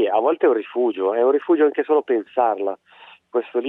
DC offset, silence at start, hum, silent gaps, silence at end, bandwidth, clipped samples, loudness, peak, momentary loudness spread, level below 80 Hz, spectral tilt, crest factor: under 0.1%; 0 s; none; none; 0 s; 3.9 kHz; under 0.1%; -20 LUFS; -6 dBFS; 9 LU; -78 dBFS; -7.5 dB/octave; 14 dB